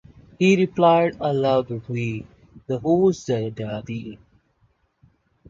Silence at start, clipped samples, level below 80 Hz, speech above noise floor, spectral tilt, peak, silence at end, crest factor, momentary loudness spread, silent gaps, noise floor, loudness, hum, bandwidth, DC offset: 0.4 s; under 0.1%; -56 dBFS; 44 dB; -7 dB/octave; -4 dBFS; 1.35 s; 18 dB; 14 LU; none; -65 dBFS; -21 LUFS; none; 7.6 kHz; under 0.1%